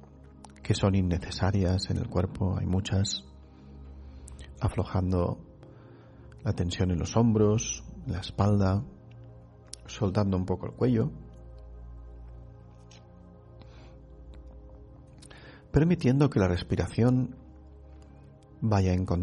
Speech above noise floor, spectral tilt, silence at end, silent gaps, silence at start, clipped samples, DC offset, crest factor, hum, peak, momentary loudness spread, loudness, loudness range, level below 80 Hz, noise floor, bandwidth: 25 dB; -6.5 dB/octave; 0 s; none; 0.45 s; under 0.1%; under 0.1%; 20 dB; none; -10 dBFS; 24 LU; -28 LUFS; 20 LU; -46 dBFS; -51 dBFS; 11 kHz